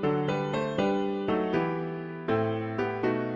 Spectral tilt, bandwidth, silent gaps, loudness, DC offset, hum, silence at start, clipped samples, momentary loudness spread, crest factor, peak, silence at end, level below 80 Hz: -7.5 dB/octave; 7.4 kHz; none; -29 LUFS; under 0.1%; none; 0 s; under 0.1%; 4 LU; 14 dB; -14 dBFS; 0 s; -58 dBFS